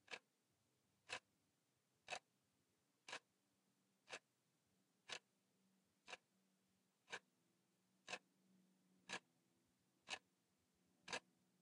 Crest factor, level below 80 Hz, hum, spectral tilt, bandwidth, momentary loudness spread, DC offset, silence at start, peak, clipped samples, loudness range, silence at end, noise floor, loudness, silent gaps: 28 dB; under -90 dBFS; none; -0.5 dB/octave; 11 kHz; 8 LU; under 0.1%; 0.1 s; -34 dBFS; under 0.1%; 4 LU; 0.4 s; -86 dBFS; -56 LUFS; none